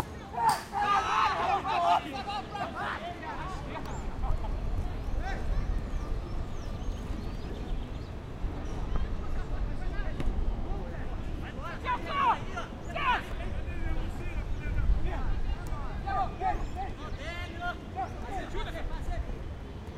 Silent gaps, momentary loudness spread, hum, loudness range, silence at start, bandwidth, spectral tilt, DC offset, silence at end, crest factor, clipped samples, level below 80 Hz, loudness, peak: none; 11 LU; none; 8 LU; 0 s; 15 kHz; -5.5 dB/octave; under 0.1%; 0 s; 18 dB; under 0.1%; -34 dBFS; -34 LUFS; -14 dBFS